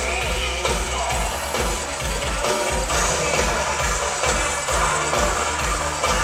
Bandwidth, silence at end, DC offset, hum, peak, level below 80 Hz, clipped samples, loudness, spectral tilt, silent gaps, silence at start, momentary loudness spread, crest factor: 16.5 kHz; 0 s; under 0.1%; none; -6 dBFS; -30 dBFS; under 0.1%; -21 LUFS; -2.5 dB/octave; none; 0 s; 4 LU; 16 dB